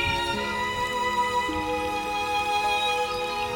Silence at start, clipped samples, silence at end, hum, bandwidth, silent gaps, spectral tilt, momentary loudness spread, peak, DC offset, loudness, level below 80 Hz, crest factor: 0 s; under 0.1%; 0 s; none; over 20 kHz; none; -3 dB/octave; 4 LU; -14 dBFS; under 0.1%; -26 LUFS; -46 dBFS; 14 dB